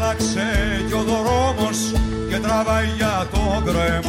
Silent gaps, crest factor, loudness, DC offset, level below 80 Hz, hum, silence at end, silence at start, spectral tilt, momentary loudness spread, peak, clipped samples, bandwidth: none; 12 dB; -20 LUFS; under 0.1%; -28 dBFS; none; 0 s; 0 s; -5 dB/octave; 3 LU; -8 dBFS; under 0.1%; 16 kHz